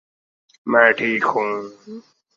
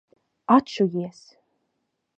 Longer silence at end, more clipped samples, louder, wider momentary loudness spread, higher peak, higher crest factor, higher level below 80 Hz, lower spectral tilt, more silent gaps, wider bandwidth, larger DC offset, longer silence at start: second, 0.35 s vs 1.05 s; neither; first, -18 LUFS vs -22 LUFS; first, 23 LU vs 17 LU; first, 0 dBFS vs -4 dBFS; about the same, 22 dB vs 22 dB; about the same, -70 dBFS vs -70 dBFS; second, -5.5 dB/octave vs -7 dB/octave; neither; second, 7.6 kHz vs 8.4 kHz; neither; first, 0.65 s vs 0.5 s